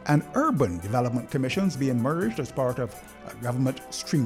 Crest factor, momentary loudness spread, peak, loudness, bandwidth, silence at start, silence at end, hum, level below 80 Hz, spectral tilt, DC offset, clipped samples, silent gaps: 16 dB; 10 LU; -10 dBFS; -27 LUFS; 16 kHz; 0 s; 0 s; none; -54 dBFS; -6.5 dB/octave; under 0.1%; under 0.1%; none